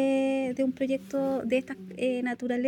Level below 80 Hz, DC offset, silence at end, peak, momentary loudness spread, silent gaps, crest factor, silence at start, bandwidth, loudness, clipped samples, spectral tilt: -70 dBFS; under 0.1%; 0 s; -16 dBFS; 4 LU; none; 12 dB; 0 s; 11.5 kHz; -29 LUFS; under 0.1%; -6 dB/octave